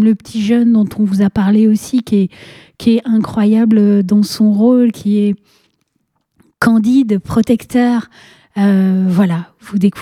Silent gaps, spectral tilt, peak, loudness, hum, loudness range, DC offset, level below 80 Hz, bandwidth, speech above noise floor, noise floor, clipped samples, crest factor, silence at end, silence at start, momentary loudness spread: none; -7.5 dB/octave; 0 dBFS; -13 LUFS; none; 3 LU; under 0.1%; -48 dBFS; 14 kHz; 54 dB; -66 dBFS; under 0.1%; 12 dB; 0 s; 0 s; 6 LU